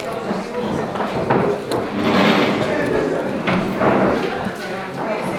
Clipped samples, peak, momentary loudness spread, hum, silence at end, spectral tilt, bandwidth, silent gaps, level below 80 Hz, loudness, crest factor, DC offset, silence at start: under 0.1%; -2 dBFS; 9 LU; none; 0 s; -6 dB/octave; 16.5 kHz; none; -46 dBFS; -19 LUFS; 16 dB; under 0.1%; 0 s